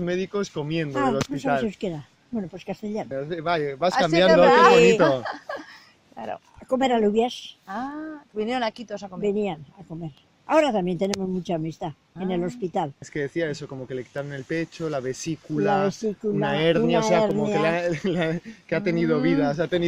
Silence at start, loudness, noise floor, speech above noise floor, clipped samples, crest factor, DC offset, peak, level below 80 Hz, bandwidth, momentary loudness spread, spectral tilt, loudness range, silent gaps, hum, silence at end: 0 s; -23 LUFS; -50 dBFS; 27 dB; under 0.1%; 20 dB; under 0.1%; -2 dBFS; -56 dBFS; 12 kHz; 16 LU; -5.5 dB/octave; 10 LU; none; none; 0 s